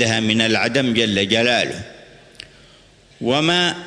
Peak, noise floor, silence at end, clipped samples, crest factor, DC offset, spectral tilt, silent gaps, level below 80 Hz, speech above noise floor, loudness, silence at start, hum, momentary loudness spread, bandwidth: -2 dBFS; -49 dBFS; 0 s; under 0.1%; 18 dB; under 0.1%; -4 dB/octave; none; -54 dBFS; 31 dB; -17 LUFS; 0 s; none; 10 LU; 11 kHz